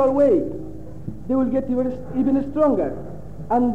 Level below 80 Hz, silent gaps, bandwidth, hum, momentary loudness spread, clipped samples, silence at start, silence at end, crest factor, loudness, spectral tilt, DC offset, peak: -44 dBFS; none; 7.2 kHz; none; 18 LU; under 0.1%; 0 s; 0 s; 14 dB; -21 LUFS; -10 dB/octave; 2%; -8 dBFS